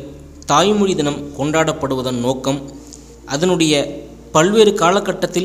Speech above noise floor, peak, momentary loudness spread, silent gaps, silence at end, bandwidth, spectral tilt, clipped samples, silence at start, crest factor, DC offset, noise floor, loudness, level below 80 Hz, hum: 22 dB; 0 dBFS; 15 LU; none; 0 s; 16 kHz; -4.5 dB/octave; under 0.1%; 0 s; 16 dB; under 0.1%; -38 dBFS; -16 LUFS; -44 dBFS; none